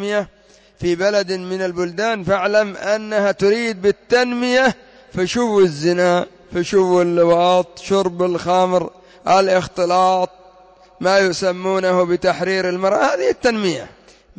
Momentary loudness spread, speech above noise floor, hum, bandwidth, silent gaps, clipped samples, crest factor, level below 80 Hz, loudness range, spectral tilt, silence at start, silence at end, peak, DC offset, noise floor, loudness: 8 LU; 31 dB; none; 8 kHz; none; under 0.1%; 14 dB; -52 dBFS; 2 LU; -5 dB/octave; 0 s; 0.5 s; -4 dBFS; under 0.1%; -47 dBFS; -17 LUFS